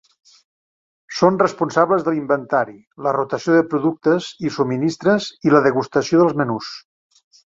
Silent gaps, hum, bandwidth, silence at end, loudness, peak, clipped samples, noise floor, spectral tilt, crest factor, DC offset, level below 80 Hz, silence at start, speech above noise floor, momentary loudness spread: 2.87-2.91 s; none; 7.8 kHz; 0.75 s; -18 LUFS; -2 dBFS; under 0.1%; under -90 dBFS; -6 dB/octave; 18 dB; under 0.1%; -62 dBFS; 1.1 s; over 72 dB; 10 LU